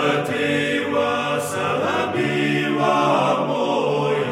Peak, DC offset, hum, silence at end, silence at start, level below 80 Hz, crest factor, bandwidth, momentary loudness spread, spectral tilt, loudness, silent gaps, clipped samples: -6 dBFS; under 0.1%; none; 0 s; 0 s; -66 dBFS; 14 dB; 16 kHz; 4 LU; -5 dB/octave; -20 LUFS; none; under 0.1%